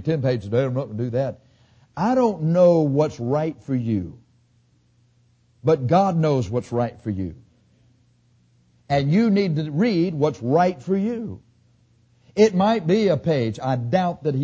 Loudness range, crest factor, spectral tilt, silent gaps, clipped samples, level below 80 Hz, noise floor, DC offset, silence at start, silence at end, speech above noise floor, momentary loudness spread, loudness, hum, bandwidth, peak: 3 LU; 16 dB; -8 dB/octave; none; under 0.1%; -52 dBFS; -61 dBFS; under 0.1%; 0 s; 0 s; 40 dB; 10 LU; -21 LUFS; 60 Hz at -50 dBFS; 8 kHz; -6 dBFS